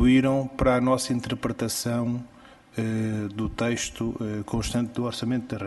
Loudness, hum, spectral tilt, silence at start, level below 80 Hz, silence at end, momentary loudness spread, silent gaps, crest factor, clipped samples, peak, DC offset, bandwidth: -26 LUFS; none; -5.5 dB/octave; 0 s; -42 dBFS; 0 s; 9 LU; none; 18 dB; under 0.1%; -8 dBFS; under 0.1%; 12 kHz